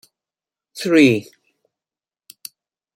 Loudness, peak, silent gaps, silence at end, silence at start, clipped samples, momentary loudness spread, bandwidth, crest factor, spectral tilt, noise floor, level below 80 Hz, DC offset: -16 LUFS; -2 dBFS; none; 1.75 s; 0.75 s; under 0.1%; 25 LU; 16.5 kHz; 20 dB; -5.5 dB/octave; under -90 dBFS; -64 dBFS; under 0.1%